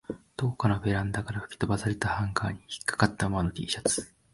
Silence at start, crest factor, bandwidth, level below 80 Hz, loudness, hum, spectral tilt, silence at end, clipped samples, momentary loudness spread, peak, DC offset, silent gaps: 0.1 s; 24 dB; 11.5 kHz; -46 dBFS; -29 LUFS; none; -5 dB/octave; 0.25 s; under 0.1%; 6 LU; -4 dBFS; under 0.1%; none